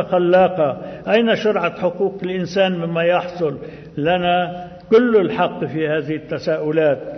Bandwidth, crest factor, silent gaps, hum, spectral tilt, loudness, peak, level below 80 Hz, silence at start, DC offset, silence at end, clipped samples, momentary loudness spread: 6.4 kHz; 16 dB; none; none; -7 dB/octave; -18 LUFS; -2 dBFS; -54 dBFS; 0 s; under 0.1%; 0 s; under 0.1%; 10 LU